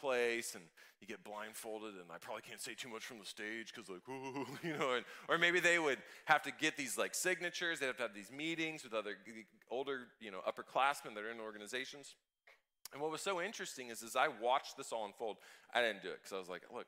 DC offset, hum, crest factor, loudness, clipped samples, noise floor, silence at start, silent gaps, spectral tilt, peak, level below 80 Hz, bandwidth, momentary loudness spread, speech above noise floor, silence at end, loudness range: under 0.1%; none; 26 dB; -40 LUFS; under 0.1%; -71 dBFS; 0 s; none; -2.5 dB/octave; -16 dBFS; -90 dBFS; 16 kHz; 15 LU; 30 dB; 0.05 s; 11 LU